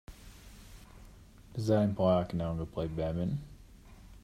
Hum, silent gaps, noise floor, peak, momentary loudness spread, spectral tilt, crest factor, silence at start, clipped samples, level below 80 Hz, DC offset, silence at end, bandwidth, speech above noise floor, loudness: none; none; -54 dBFS; -14 dBFS; 25 LU; -8 dB/octave; 20 dB; 0.1 s; under 0.1%; -52 dBFS; under 0.1%; 0.05 s; 15.5 kHz; 23 dB; -32 LUFS